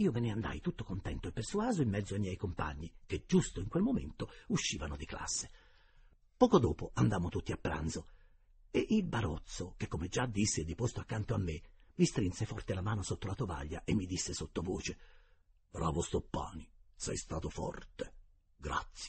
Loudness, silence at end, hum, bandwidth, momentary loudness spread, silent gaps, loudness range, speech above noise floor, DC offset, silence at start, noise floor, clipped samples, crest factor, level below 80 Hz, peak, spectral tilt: -36 LUFS; 0 s; none; 8.4 kHz; 11 LU; none; 6 LU; 31 dB; under 0.1%; 0 s; -67 dBFS; under 0.1%; 24 dB; -50 dBFS; -12 dBFS; -5.5 dB/octave